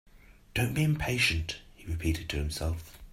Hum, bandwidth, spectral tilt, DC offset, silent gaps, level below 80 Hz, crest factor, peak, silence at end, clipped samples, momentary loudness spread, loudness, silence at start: none; 16 kHz; -4.5 dB/octave; under 0.1%; none; -42 dBFS; 18 dB; -14 dBFS; 0 s; under 0.1%; 13 LU; -31 LUFS; 0.15 s